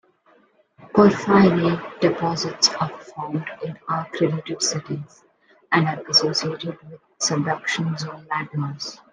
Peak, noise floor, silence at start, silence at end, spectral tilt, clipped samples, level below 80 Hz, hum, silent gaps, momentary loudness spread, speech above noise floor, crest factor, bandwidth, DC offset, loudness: -2 dBFS; -58 dBFS; 0.8 s; 0.15 s; -4 dB/octave; under 0.1%; -60 dBFS; none; none; 15 LU; 36 dB; 20 dB; 10.5 kHz; under 0.1%; -21 LUFS